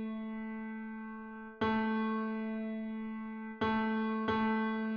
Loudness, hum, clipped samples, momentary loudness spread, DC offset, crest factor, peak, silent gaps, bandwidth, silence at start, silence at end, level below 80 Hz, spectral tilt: -36 LUFS; none; under 0.1%; 11 LU; under 0.1%; 14 dB; -22 dBFS; none; 5.4 kHz; 0 s; 0 s; -64 dBFS; -4.5 dB/octave